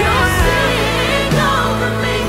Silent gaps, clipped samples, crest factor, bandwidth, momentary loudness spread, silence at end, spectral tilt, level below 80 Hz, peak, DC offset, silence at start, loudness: none; under 0.1%; 14 dB; 16 kHz; 3 LU; 0 s; -4.5 dB/octave; -24 dBFS; -2 dBFS; under 0.1%; 0 s; -14 LUFS